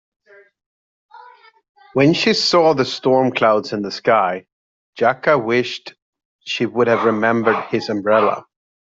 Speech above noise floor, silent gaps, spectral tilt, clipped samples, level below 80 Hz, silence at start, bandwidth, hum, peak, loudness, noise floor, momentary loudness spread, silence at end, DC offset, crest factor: 29 dB; 1.69-1.75 s, 4.52-4.93 s, 6.02-6.13 s, 6.25-6.39 s; -5 dB/octave; under 0.1%; -62 dBFS; 1.15 s; 7.8 kHz; none; -2 dBFS; -17 LUFS; -45 dBFS; 11 LU; 0.5 s; under 0.1%; 16 dB